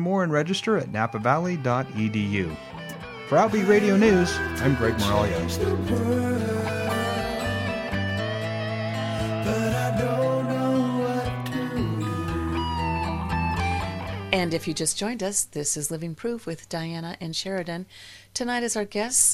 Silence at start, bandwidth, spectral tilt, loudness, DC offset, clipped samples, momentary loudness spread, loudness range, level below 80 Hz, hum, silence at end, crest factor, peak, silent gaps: 0 s; 16 kHz; -4.5 dB/octave; -25 LUFS; under 0.1%; under 0.1%; 10 LU; 6 LU; -44 dBFS; none; 0 s; 20 dB; -4 dBFS; none